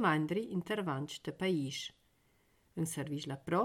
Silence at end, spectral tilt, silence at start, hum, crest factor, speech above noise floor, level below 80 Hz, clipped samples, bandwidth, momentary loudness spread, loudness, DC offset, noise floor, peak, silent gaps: 0 s; -5.5 dB/octave; 0 s; none; 18 dB; 36 dB; -72 dBFS; under 0.1%; 17 kHz; 8 LU; -37 LUFS; under 0.1%; -72 dBFS; -18 dBFS; none